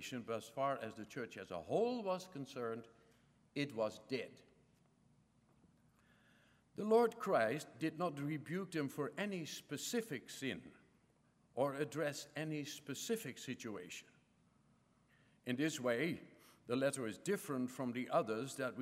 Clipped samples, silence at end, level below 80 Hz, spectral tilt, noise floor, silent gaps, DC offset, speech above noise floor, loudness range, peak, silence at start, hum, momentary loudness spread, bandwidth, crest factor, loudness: under 0.1%; 0 s; -84 dBFS; -5 dB/octave; -74 dBFS; none; under 0.1%; 33 dB; 8 LU; -22 dBFS; 0 s; none; 12 LU; 16 kHz; 20 dB; -41 LUFS